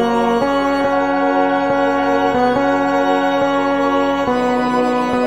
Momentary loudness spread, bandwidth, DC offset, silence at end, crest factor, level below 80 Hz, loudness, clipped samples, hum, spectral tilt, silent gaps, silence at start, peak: 1 LU; 11.5 kHz; 0.5%; 0 s; 14 dB; -44 dBFS; -16 LUFS; under 0.1%; none; -5.5 dB/octave; none; 0 s; -2 dBFS